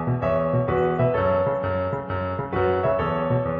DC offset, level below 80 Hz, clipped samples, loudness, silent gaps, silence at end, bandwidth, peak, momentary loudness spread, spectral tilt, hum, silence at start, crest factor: under 0.1%; -46 dBFS; under 0.1%; -23 LUFS; none; 0 s; 5 kHz; -10 dBFS; 6 LU; -10 dB/octave; none; 0 s; 14 dB